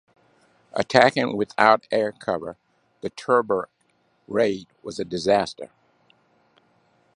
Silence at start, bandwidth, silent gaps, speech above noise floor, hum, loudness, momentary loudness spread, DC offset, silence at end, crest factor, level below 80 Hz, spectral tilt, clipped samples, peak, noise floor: 0.75 s; 11 kHz; none; 44 dB; none; -22 LUFS; 18 LU; under 0.1%; 1.5 s; 24 dB; -62 dBFS; -5 dB/octave; under 0.1%; 0 dBFS; -66 dBFS